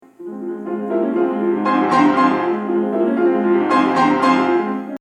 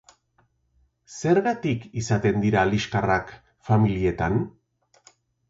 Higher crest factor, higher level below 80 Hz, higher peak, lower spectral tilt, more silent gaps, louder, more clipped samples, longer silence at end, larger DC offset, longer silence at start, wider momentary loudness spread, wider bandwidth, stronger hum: about the same, 16 dB vs 18 dB; second, -64 dBFS vs -46 dBFS; first, -2 dBFS vs -8 dBFS; about the same, -6.5 dB/octave vs -6.5 dB/octave; neither; first, -17 LUFS vs -23 LUFS; neither; second, 0.05 s vs 1 s; neither; second, 0.2 s vs 1.1 s; about the same, 11 LU vs 11 LU; first, 9.6 kHz vs 7.8 kHz; neither